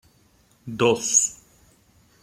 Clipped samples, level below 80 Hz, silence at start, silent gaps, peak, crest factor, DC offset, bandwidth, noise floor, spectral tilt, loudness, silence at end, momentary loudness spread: under 0.1%; -62 dBFS; 0.65 s; none; -6 dBFS; 20 dB; under 0.1%; 15.5 kHz; -60 dBFS; -2.5 dB/octave; -20 LUFS; 0.9 s; 20 LU